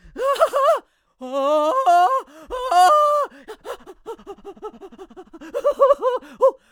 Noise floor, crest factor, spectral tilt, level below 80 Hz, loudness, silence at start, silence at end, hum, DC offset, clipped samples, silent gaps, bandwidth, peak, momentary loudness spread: -41 dBFS; 18 dB; -2 dB/octave; -56 dBFS; -18 LUFS; 0.15 s; 0.2 s; none; under 0.1%; under 0.1%; none; over 20 kHz; -2 dBFS; 22 LU